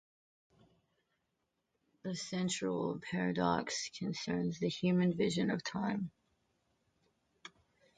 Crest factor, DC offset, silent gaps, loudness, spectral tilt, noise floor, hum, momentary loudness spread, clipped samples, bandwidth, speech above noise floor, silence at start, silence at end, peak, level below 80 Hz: 20 dB; under 0.1%; none; -36 LUFS; -5 dB/octave; -84 dBFS; none; 14 LU; under 0.1%; 9.4 kHz; 49 dB; 2.05 s; 0.5 s; -18 dBFS; -70 dBFS